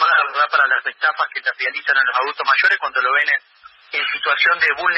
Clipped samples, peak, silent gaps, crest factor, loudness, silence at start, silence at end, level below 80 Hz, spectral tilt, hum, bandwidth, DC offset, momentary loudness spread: under 0.1%; -4 dBFS; none; 14 dB; -17 LUFS; 0 s; 0 s; -68 dBFS; -1.5 dB/octave; none; 7.8 kHz; under 0.1%; 6 LU